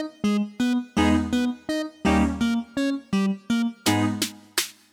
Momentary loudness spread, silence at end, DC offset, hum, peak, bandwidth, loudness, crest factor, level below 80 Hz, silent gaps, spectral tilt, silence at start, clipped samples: 5 LU; 0.2 s; under 0.1%; none; -8 dBFS; 19 kHz; -24 LUFS; 16 dB; -42 dBFS; none; -4.5 dB/octave; 0 s; under 0.1%